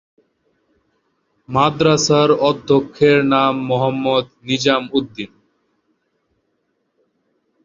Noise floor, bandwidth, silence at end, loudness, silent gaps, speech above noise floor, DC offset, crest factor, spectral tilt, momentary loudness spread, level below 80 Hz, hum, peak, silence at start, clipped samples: -69 dBFS; 7.6 kHz; 2.4 s; -16 LUFS; none; 53 dB; under 0.1%; 18 dB; -5 dB/octave; 9 LU; -54 dBFS; none; 0 dBFS; 1.5 s; under 0.1%